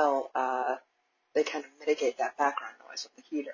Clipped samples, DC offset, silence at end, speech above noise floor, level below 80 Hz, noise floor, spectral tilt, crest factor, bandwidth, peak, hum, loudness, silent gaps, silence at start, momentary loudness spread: under 0.1%; under 0.1%; 0 s; 44 dB; -80 dBFS; -75 dBFS; -2 dB/octave; 20 dB; 7.4 kHz; -12 dBFS; none; -32 LUFS; none; 0 s; 11 LU